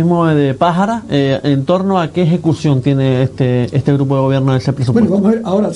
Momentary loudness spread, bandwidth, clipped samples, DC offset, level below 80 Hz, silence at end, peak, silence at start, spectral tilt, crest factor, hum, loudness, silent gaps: 3 LU; 10.5 kHz; under 0.1%; under 0.1%; -46 dBFS; 0 s; 0 dBFS; 0 s; -8 dB/octave; 12 dB; none; -13 LUFS; none